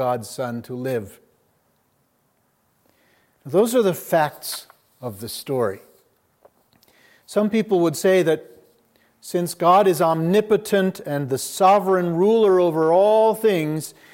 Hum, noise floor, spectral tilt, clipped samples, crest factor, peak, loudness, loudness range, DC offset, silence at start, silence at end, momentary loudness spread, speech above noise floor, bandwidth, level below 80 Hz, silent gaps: none; -66 dBFS; -5.5 dB/octave; under 0.1%; 18 dB; -4 dBFS; -20 LUFS; 10 LU; under 0.1%; 0 s; 0.25 s; 15 LU; 47 dB; 17 kHz; -70 dBFS; none